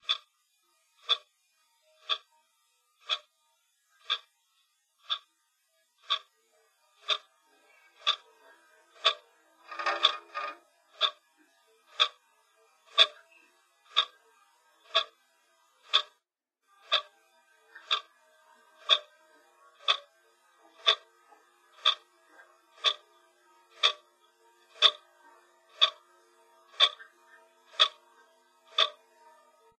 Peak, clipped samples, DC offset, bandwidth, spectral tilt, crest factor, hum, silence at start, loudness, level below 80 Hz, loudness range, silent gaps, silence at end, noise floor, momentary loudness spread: -4 dBFS; under 0.1%; under 0.1%; 13 kHz; 3.5 dB/octave; 30 dB; none; 0.1 s; -29 LUFS; under -90 dBFS; 8 LU; none; 0.9 s; -83 dBFS; 15 LU